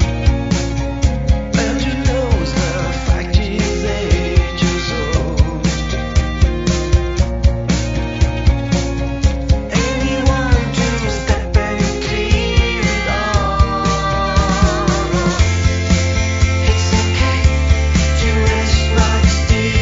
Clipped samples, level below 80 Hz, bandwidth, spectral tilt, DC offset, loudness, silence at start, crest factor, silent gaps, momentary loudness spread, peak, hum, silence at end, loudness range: under 0.1%; -18 dBFS; 7.8 kHz; -5.5 dB/octave; under 0.1%; -16 LUFS; 0 s; 14 dB; none; 4 LU; 0 dBFS; none; 0 s; 2 LU